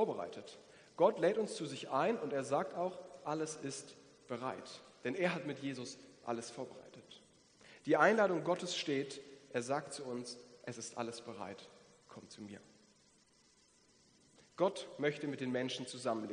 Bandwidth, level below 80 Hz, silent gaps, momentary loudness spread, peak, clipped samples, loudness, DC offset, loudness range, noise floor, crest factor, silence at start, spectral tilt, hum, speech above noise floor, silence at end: 10 kHz; -86 dBFS; none; 22 LU; -14 dBFS; under 0.1%; -38 LUFS; under 0.1%; 13 LU; -70 dBFS; 26 dB; 0 s; -4.5 dB/octave; none; 32 dB; 0 s